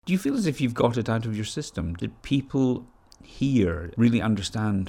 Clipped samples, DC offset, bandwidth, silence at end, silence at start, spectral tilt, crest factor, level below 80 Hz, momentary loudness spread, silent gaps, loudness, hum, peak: under 0.1%; under 0.1%; 15.5 kHz; 0 s; 0.05 s; -6.5 dB/octave; 18 dB; -46 dBFS; 9 LU; none; -26 LUFS; none; -8 dBFS